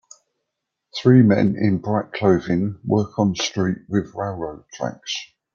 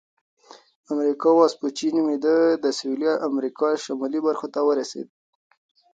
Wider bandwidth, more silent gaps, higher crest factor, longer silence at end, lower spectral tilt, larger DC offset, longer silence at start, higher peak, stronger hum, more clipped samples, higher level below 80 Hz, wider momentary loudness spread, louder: second, 7.2 kHz vs 9 kHz; neither; about the same, 18 dB vs 18 dB; second, 0.3 s vs 0.9 s; first, -6.5 dB/octave vs -4 dB/octave; neither; about the same, 0.95 s vs 0.9 s; about the same, -4 dBFS vs -4 dBFS; neither; neither; first, -56 dBFS vs -78 dBFS; first, 15 LU vs 8 LU; about the same, -20 LUFS vs -22 LUFS